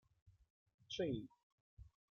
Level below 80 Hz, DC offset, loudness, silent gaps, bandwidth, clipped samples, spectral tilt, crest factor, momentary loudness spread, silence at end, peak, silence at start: -70 dBFS; under 0.1%; -45 LUFS; 0.50-0.66 s, 0.74-0.78 s, 1.43-1.77 s; 7 kHz; under 0.1%; -5.5 dB/octave; 20 dB; 23 LU; 0.25 s; -30 dBFS; 0.25 s